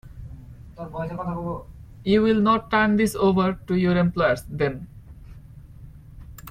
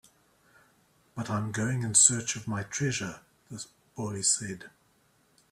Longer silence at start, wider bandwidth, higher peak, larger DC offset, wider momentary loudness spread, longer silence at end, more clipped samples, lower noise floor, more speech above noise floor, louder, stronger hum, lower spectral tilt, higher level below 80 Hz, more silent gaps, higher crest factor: second, 0.05 s vs 1.15 s; about the same, 15.5 kHz vs 15 kHz; second, -8 dBFS vs -4 dBFS; neither; about the same, 23 LU vs 23 LU; second, 0 s vs 0.85 s; neither; second, -44 dBFS vs -67 dBFS; second, 22 dB vs 38 dB; first, -22 LUFS vs -26 LUFS; neither; first, -7 dB/octave vs -3 dB/octave; first, -44 dBFS vs -64 dBFS; neither; second, 16 dB vs 28 dB